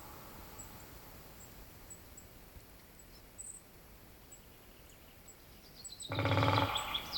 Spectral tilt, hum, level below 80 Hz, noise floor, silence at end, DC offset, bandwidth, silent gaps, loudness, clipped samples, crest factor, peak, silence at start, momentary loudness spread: -4.5 dB/octave; none; -60 dBFS; -57 dBFS; 0 s; under 0.1%; 18.5 kHz; none; -37 LUFS; under 0.1%; 28 dB; -14 dBFS; 0 s; 24 LU